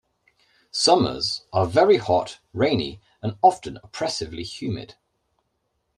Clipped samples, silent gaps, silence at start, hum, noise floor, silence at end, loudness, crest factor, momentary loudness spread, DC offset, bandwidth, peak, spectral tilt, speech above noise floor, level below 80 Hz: under 0.1%; none; 0.75 s; none; -74 dBFS; 1.1 s; -22 LUFS; 20 dB; 15 LU; under 0.1%; 12 kHz; -4 dBFS; -4.5 dB/octave; 52 dB; -54 dBFS